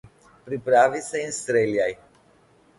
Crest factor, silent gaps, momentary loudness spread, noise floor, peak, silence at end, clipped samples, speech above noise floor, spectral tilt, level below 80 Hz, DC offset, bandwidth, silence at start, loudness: 20 dB; none; 13 LU; -58 dBFS; -6 dBFS; 0.85 s; under 0.1%; 36 dB; -4 dB/octave; -62 dBFS; under 0.1%; 11.5 kHz; 0.45 s; -23 LUFS